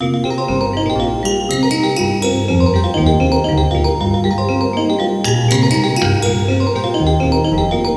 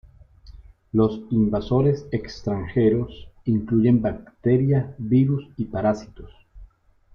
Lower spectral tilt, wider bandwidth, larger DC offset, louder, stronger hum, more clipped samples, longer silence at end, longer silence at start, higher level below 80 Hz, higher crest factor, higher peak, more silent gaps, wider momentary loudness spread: second, -6 dB/octave vs -9.5 dB/octave; first, 11 kHz vs 6.8 kHz; neither; first, -15 LUFS vs -22 LUFS; neither; neither; second, 0 s vs 0.5 s; second, 0 s vs 0.45 s; first, -26 dBFS vs -46 dBFS; about the same, 14 dB vs 16 dB; first, 0 dBFS vs -8 dBFS; neither; second, 4 LU vs 9 LU